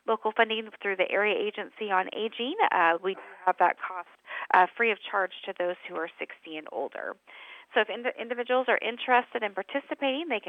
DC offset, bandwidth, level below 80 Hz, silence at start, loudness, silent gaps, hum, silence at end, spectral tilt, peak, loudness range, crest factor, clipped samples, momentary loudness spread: under 0.1%; 8.4 kHz; -86 dBFS; 0.05 s; -28 LUFS; none; none; 0 s; -5.5 dB/octave; -8 dBFS; 6 LU; 22 dB; under 0.1%; 13 LU